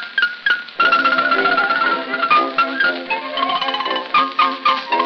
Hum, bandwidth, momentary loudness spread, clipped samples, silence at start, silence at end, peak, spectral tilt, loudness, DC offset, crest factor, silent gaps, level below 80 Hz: none; 6.4 kHz; 5 LU; under 0.1%; 0 s; 0 s; -2 dBFS; -3.5 dB/octave; -16 LUFS; under 0.1%; 16 dB; none; -72 dBFS